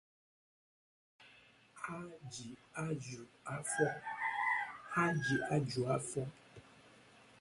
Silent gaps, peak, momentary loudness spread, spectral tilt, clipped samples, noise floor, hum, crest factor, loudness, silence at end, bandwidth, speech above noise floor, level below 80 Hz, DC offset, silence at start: none; -20 dBFS; 14 LU; -5 dB/octave; under 0.1%; -64 dBFS; none; 20 dB; -38 LUFS; 0.05 s; 11.5 kHz; 26 dB; -72 dBFS; under 0.1%; 1.2 s